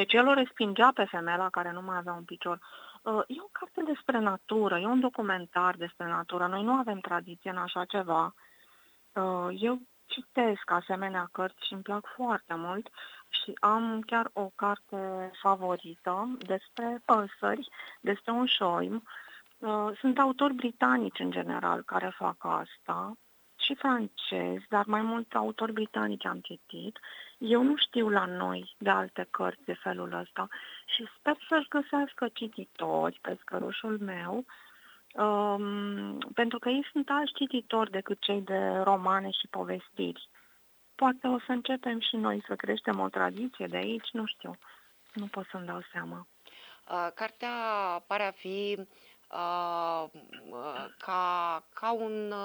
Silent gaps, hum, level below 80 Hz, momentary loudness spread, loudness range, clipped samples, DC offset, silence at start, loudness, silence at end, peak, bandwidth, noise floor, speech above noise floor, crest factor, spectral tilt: none; none; -82 dBFS; 13 LU; 5 LU; under 0.1%; under 0.1%; 0 s; -31 LUFS; 0 s; -8 dBFS; over 20 kHz; -63 dBFS; 32 dB; 24 dB; -6 dB/octave